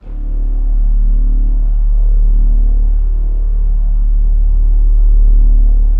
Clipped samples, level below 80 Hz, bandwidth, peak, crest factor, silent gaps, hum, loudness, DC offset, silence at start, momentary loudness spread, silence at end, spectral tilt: under 0.1%; -8 dBFS; 1 kHz; -2 dBFS; 8 dB; none; none; -16 LUFS; under 0.1%; 0.05 s; 5 LU; 0 s; -12 dB/octave